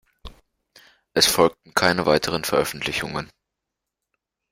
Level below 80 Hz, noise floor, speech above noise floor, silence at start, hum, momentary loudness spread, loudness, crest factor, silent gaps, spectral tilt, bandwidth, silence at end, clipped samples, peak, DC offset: -50 dBFS; -83 dBFS; 62 dB; 0.25 s; none; 12 LU; -21 LUFS; 22 dB; none; -3 dB/octave; 16 kHz; 1.25 s; under 0.1%; -2 dBFS; under 0.1%